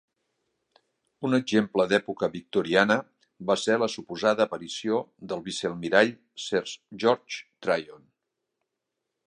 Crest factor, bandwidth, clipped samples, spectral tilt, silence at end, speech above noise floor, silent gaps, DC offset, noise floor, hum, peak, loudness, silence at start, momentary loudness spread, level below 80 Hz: 24 dB; 11 kHz; under 0.1%; -4.5 dB/octave; 1.3 s; 57 dB; none; under 0.1%; -84 dBFS; none; -4 dBFS; -26 LUFS; 1.2 s; 12 LU; -68 dBFS